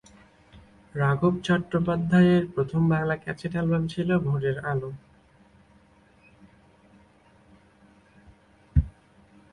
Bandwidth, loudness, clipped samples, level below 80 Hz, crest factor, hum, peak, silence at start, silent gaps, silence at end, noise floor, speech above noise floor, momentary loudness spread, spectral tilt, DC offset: 9.8 kHz; -25 LUFS; under 0.1%; -42 dBFS; 20 dB; none; -8 dBFS; 0.55 s; none; 0.6 s; -58 dBFS; 34 dB; 11 LU; -8.5 dB/octave; under 0.1%